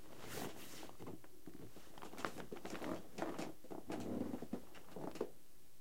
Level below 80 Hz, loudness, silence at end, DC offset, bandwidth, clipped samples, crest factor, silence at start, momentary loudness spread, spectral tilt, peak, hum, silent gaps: -70 dBFS; -49 LUFS; 0 s; 0.4%; 16.5 kHz; under 0.1%; 28 dB; 0 s; 12 LU; -5 dB/octave; -20 dBFS; none; none